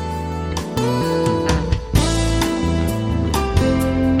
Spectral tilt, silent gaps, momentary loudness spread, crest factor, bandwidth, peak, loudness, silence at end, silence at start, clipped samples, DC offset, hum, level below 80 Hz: -6 dB/octave; none; 6 LU; 16 dB; 16.5 kHz; -2 dBFS; -19 LUFS; 0 s; 0 s; under 0.1%; 0.1%; none; -26 dBFS